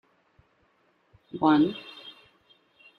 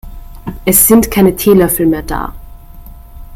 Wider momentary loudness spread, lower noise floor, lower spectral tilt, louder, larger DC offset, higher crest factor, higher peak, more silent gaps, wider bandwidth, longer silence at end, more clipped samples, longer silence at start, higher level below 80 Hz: first, 23 LU vs 19 LU; first, -67 dBFS vs -32 dBFS; first, -8 dB/octave vs -5 dB/octave; second, -24 LUFS vs -10 LUFS; neither; first, 22 dB vs 12 dB; second, -8 dBFS vs 0 dBFS; neither; second, 5 kHz vs over 20 kHz; first, 0.9 s vs 0 s; second, under 0.1% vs 0.2%; first, 1.35 s vs 0.05 s; second, -70 dBFS vs -28 dBFS